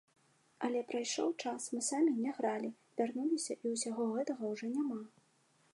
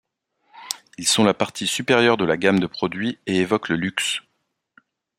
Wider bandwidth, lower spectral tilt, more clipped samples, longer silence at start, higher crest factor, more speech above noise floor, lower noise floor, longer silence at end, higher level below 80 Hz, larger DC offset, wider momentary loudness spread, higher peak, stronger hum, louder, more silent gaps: second, 11.5 kHz vs 16 kHz; about the same, -3.5 dB/octave vs -3.5 dB/octave; neither; about the same, 0.6 s vs 0.55 s; about the same, 18 dB vs 22 dB; second, 36 dB vs 53 dB; about the same, -72 dBFS vs -74 dBFS; second, 0.65 s vs 1 s; second, under -90 dBFS vs -60 dBFS; neither; about the same, 8 LU vs 10 LU; second, -20 dBFS vs 0 dBFS; neither; second, -37 LUFS vs -21 LUFS; neither